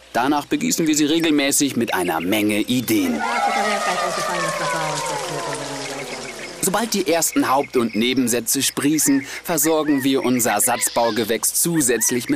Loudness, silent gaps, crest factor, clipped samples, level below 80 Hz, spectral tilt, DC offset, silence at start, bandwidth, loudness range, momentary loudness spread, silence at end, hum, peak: -19 LUFS; none; 12 dB; under 0.1%; -56 dBFS; -3 dB/octave; under 0.1%; 0.15 s; 15.5 kHz; 4 LU; 7 LU; 0 s; none; -8 dBFS